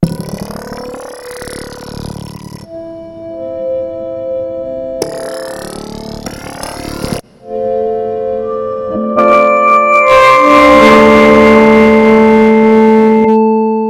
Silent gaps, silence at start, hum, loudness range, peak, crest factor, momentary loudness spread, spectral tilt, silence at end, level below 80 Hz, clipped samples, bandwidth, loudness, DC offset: none; 0 s; none; 18 LU; 0 dBFS; 10 dB; 21 LU; -6 dB/octave; 0 s; -36 dBFS; 1%; 16.5 kHz; -8 LUFS; under 0.1%